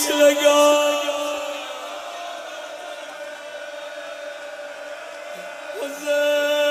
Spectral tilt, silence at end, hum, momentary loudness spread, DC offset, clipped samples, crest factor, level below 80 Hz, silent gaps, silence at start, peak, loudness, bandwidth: 0 dB/octave; 0 s; none; 19 LU; under 0.1%; under 0.1%; 18 dB; -74 dBFS; none; 0 s; -4 dBFS; -20 LUFS; 15.5 kHz